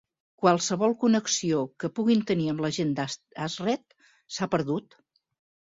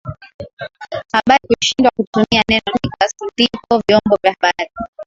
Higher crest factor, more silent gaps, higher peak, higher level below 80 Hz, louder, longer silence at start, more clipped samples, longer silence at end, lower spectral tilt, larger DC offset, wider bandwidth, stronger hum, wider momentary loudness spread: about the same, 20 dB vs 16 dB; second, none vs 0.34-0.39 s, 0.53-0.57 s, 2.07-2.13 s, 4.88-4.93 s; second, -8 dBFS vs 0 dBFS; second, -66 dBFS vs -44 dBFS; second, -27 LUFS vs -15 LUFS; first, 0.4 s vs 0.05 s; neither; first, 0.95 s vs 0.05 s; about the same, -4.5 dB/octave vs -4 dB/octave; neither; about the same, 7.8 kHz vs 7.8 kHz; neither; second, 10 LU vs 18 LU